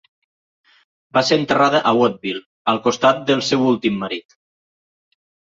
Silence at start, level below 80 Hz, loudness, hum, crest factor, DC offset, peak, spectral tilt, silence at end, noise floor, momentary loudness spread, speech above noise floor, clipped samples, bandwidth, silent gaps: 1.15 s; -60 dBFS; -18 LUFS; none; 18 dB; under 0.1%; -2 dBFS; -4.5 dB/octave; 1.35 s; under -90 dBFS; 11 LU; over 73 dB; under 0.1%; 7.8 kHz; 2.46-2.65 s